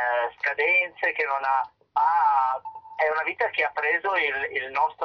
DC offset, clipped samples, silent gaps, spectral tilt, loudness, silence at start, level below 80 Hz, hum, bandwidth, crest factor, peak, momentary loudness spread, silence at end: under 0.1%; under 0.1%; none; -3.5 dB/octave; -24 LUFS; 0 s; -68 dBFS; none; 6.2 kHz; 14 dB; -12 dBFS; 7 LU; 0 s